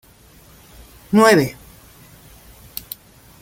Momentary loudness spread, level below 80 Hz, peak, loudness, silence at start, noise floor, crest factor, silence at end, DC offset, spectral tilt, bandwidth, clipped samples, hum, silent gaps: 22 LU; -50 dBFS; 0 dBFS; -15 LUFS; 1.1 s; -48 dBFS; 22 dB; 1.9 s; under 0.1%; -5 dB/octave; 17 kHz; under 0.1%; none; none